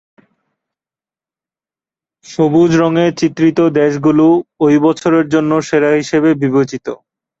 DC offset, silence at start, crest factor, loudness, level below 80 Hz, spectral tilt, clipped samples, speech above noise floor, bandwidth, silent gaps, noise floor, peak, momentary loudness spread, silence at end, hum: under 0.1%; 2.3 s; 12 dB; -12 LUFS; -54 dBFS; -6.5 dB/octave; under 0.1%; over 78 dB; 7.8 kHz; none; under -90 dBFS; -2 dBFS; 6 LU; 0.45 s; none